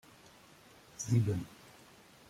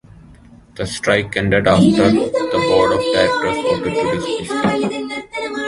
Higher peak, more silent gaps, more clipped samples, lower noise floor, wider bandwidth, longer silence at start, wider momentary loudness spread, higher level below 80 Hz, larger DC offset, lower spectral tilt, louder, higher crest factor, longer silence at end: second, -18 dBFS vs 0 dBFS; neither; neither; first, -59 dBFS vs -43 dBFS; first, 15 kHz vs 11.5 kHz; first, 1 s vs 0.3 s; first, 26 LU vs 12 LU; second, -66 dBFS vs -42 dBFS; neither; about the same, -6.5 dB/octave vs -5.5 dB/octave; second, -34 LUFS vs -16 LUFS; about the same, 20 dB vs 16 dB; first, 0.75 s vs 0 s